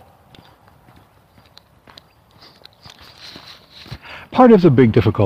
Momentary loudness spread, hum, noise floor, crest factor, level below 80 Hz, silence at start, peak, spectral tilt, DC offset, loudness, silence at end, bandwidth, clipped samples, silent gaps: 28 LU; none; -51 dBFS; 18 dB; -46 dBFS; 3.9 s; 0 dBFS; -9 dB/octave; under 0.1%; -12 LUFS; 0 s; 7 kHz; under 0.1%; none